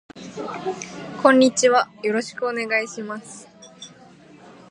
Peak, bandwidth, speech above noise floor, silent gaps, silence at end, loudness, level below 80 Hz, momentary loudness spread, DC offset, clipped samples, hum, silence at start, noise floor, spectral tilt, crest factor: -2 dBFS; 11 kHz; 27 dB; none; 0.2 s; -20 LUFS; -68 dBFS; 25 LU; under 0.1%; under 0.1%; none; 0.15 s; -48 dBFS; -3 dB/octave; 22 dB